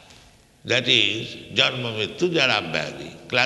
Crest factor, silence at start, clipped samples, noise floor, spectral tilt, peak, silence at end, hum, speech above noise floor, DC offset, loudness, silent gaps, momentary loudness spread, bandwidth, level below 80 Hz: 22 dB; 0.1 s; under 0.1%; -52 dBFS; -3.5 dB/octave; -2 dBFS; 0 s; none; 29 dB; under 0.1%; -21 LUFS; none; 13 LU; 12 kHz; -60 dBFS